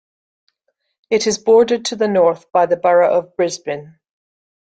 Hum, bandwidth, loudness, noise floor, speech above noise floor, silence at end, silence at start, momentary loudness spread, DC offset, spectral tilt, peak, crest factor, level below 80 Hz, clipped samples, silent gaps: none; 9.2 kHz; -16 LUFS; -71 dBFS; 55 dB; 0.85 s; 1.1 s; 8 LU; under 0.1%; -4 dB/octave; -2 dBFS; 16 dB; -62 dBFS; under 0.1%; none